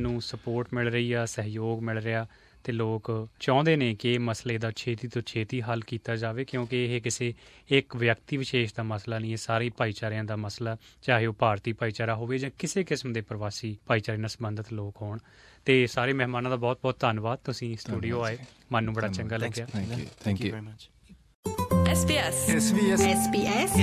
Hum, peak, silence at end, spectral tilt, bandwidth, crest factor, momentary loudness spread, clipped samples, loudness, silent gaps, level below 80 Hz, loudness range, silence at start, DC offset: none; -6 dBFS; 0 s; -5 dB/octave; 14.5 kHz; 22 dB; 11 LU; under 0.1%; -29 LUFS; 21.35-21.43 s; -48 dBFS; 4 LU; 0 s; under 0.1%